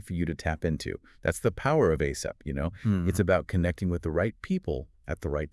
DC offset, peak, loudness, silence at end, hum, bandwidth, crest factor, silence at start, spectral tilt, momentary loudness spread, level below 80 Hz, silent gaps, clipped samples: under 0.1%; -10 dBFS; -29 LUFS; 0.05 s; none; 12 kHz; 18 dB; 0.05 s; -6.5 dB/octave; 10 LU; -44 dBFS; none; under 0.1%